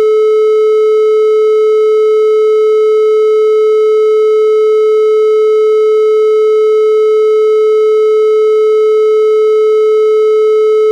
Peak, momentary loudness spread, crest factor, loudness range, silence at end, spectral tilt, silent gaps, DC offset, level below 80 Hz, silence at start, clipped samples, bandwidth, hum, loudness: -2 dBFS; 0 LU; 4 dB; 0 LU; 0 s; -2 dB/octave; none; under 0.1%; -88 dBFS; 0 s; under 0.1%; 7.8 kHz; none; -9 LUFS